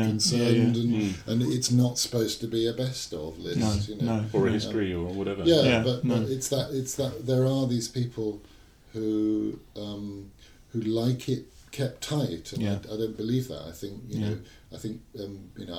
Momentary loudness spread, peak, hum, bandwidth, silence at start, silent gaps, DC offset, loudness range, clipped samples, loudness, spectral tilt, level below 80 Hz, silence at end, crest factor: 15 LU; -8 dBFS; none; 16 kHz; 0 s; none; under 0.1%; 6 LU; under 0.1%; -28 LUFS; -5.5 dB/octave; -52 dBFS; 0 s; 18 dB